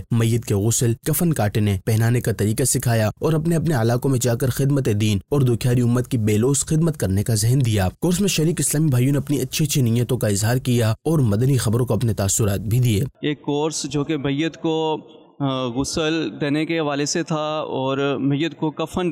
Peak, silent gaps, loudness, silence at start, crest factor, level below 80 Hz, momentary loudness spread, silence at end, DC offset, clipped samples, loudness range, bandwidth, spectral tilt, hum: -10 dBFS; none; -20 LUFS; 0 s; 10 dB; -46 dBFS; 5 LU; 0 s; under 0.1%; under 0.1%; 3 LU; 16 kHz; -5.5 dB/octave; none